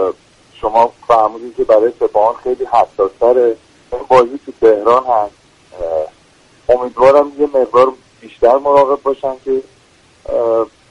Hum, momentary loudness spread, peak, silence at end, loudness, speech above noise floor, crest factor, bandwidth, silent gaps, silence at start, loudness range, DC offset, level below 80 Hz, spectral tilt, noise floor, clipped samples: none; 11 LU; 0 dBFS; 0.25 s; -13 LUFS; 36 dB; 14 dB; 10.5 kHz; none; 0 s; 2 LU; under 0.1%; -46 dBFS; -6 dB/octave; -48 dBFS; under 0.1%